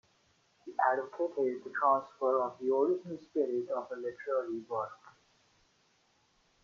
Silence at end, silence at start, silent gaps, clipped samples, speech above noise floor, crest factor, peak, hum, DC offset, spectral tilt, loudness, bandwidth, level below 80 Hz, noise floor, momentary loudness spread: 1.55 s; 0.65 s; none; under 0.1%; 39 dB; 20 dB; -14 dBFS; none; under 0.1%; -7 dB/octave; -33 LUFS; 7.2 kHz; -84 dBFS; -71 dBFS; 9 LU